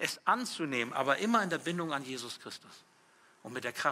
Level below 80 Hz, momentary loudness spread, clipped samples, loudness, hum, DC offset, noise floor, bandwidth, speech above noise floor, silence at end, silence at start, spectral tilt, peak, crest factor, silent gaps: -84 dBFS; 15 LU; under 0.1%; -33 LUFS; none; under 0.1%; -64 dBFS; 16 kHz; 30 dB; 0 s; 0 s; -3.5 dB/octave; -12 dBFS; 22 dB; none